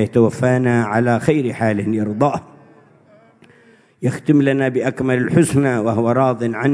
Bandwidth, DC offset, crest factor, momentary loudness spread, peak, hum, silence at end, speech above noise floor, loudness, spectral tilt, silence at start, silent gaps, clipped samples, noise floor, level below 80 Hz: 11 kHz; under 0.1%; 18 dB; 5 LU; 0 dBFS; none; 0 s; 34 dB; -17 LUFS; -7.5 dB/octave; 0 s; none; under 0.1%; -51 dBFS; -54 dBFS